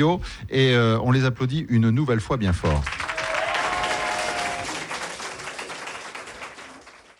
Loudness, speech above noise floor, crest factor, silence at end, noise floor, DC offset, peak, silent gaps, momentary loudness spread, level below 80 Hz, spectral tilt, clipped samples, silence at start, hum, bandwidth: -24 LUFS; 26 dB; 14 dB; 0.25 s; -47 dBFS; under 0.1%; -10 dBFS; none; 16 LU; -40 dBFS; -5.5 dB/octave; under 0.1%; 0 s; none; 12 kHz